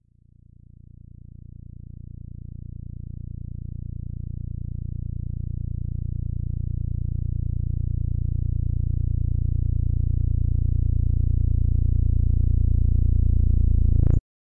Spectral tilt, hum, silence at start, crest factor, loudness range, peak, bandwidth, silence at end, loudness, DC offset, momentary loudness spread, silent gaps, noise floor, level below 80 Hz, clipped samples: -14 dB/octave; 60 Hz at -85 dBFS; 0 s; 16 dB; 15 LU; -8 dBFS; 0.8 kHz; 0.35 s; -25 LUFS; under 0.1%; 17 LU; none; -54 dBFS; -26 dBFS; under 0.1%